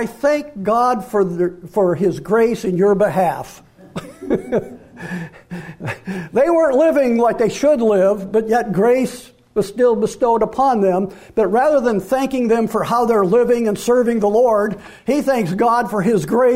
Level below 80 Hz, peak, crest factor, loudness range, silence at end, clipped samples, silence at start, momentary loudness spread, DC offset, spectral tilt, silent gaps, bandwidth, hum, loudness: -48 dBFS; -6 dBFS; 10 dB; 5 LU; 0 s; under 0.1%; 0 s; 14 LU; under 0.1%; -6.5 dB/octave; none; 16 kHz; none; -17 LUFS